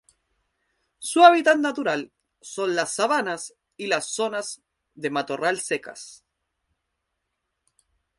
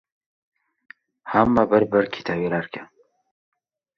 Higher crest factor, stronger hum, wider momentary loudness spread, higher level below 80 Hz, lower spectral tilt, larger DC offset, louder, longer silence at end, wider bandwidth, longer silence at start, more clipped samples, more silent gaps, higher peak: about the same, 24 dB vs 22 dB; neither; first, 23 LU vs 18 LU; second, -74 dBFS vs -54 dBFS; second, -2.5 dB/octave vs -8 dB/octave; neither; about the same, -22 LUFS vs -21 LUFS; first, 2.05 s vs 1.15 s; first, 11.5 kHz vs 7 kHz; second, 1 s vs 1.25 s; neither; neither; about the same, 0 dBFS vs -2 dBFS